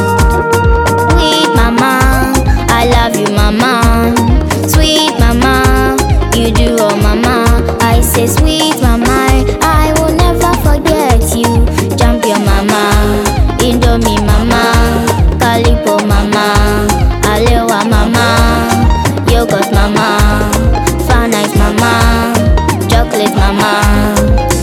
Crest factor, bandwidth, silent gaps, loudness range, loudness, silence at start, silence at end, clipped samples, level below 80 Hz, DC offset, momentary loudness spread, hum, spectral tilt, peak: 8 dB; 17.5 kHz; none; 1 LU; -10 LUFS; 0 s; 0 s; 0.3%; -14 dBFS; under 0.1%; 2 LU; none; -5 dB/octave; 0 dBFS